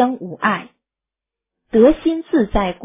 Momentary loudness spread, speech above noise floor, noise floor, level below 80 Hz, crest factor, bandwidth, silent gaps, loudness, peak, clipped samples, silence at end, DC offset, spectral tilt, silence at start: 7 LU; 70 dB; -87 dBFS; -36 dBFS; 16 dB; 3.8 kHz; none; -17 LUFS; -2 dBFS; under 0.1%; 0 s; under 0.1%; -10.5 dB/octave; 0 s